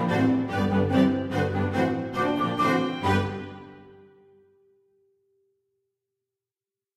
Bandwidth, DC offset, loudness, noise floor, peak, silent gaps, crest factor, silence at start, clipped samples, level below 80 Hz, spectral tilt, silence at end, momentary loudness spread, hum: 13 kHz; under 0.1%; -25 LUFS; under -90 dBFS; -10 dBFS; none; 18 dB; 0 s; under 0.1%; -58 dBFS; -7 dB/octave; 3.05 s; 7 LU; none